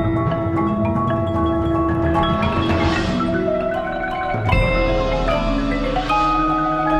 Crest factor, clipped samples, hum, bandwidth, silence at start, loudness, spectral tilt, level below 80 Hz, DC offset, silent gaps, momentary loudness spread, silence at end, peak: 14 dB; under 0.1%; none; 9.6 kHz; 0 s; -19 LUFS; -7.5 dB/octave; -28 dBFS; under 0.1%; none; 4 LU; 0 s; -4 dBFS